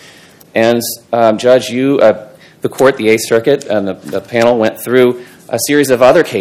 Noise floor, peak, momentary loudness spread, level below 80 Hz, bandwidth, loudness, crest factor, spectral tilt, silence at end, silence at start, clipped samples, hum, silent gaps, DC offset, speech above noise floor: -40 dBFS; 0 dBFS; 12 LU; -54 dBFS; 17 kHz; -12 LUFS; 12 dB; -4.5 dB/octave; 0 s; 0.55 s; 1%; none; none; under 0.1%; 29 dB